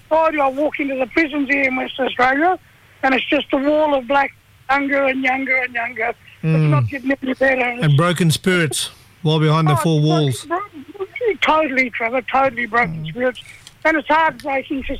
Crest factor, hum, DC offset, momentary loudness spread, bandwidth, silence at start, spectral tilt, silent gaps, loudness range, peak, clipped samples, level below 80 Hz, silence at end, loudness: 14 dB; none; under 0.1%; 8 LU; 15 kHz; 0.1 s; -5.5 dB/octave; none; 2 LU; -4 dBFS; under 0.1%; -46 dBFS; 0 s; -18 LUFS